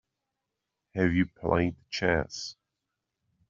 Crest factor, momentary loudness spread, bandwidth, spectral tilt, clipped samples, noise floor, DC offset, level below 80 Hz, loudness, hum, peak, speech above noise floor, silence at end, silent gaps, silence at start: 22 dB; 12 LU; 7.6 kHz; -5 dB/octave; under 0.1%; -85 dBFS; under 0.1%; -54 dBFS; -29 LUFS; none; -8 dBFS; 57 dB; 1 s; none; 0.95 s